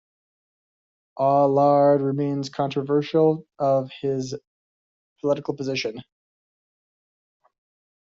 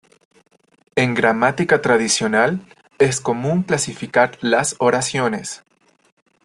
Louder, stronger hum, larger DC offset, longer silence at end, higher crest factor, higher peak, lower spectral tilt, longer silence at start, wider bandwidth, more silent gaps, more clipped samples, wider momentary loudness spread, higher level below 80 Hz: second, -22 LUFS vs -18 LUFS; neither; neither; first, 2.1 s vs 0.9 s; about the same, 18 dB vs 18 dB; second, -8 dBFS vs -2 dBFS; first, -6 dB/octave vs -4 dB/octave; first, 1.15 s vs 0.95 s; second, 7.6 kHz vs 12.5 kHz; first, 4.47-5.16 s vs none; neither; first, 12 LU vs 7 LU; second, -70 dBFS vs -56 dBFS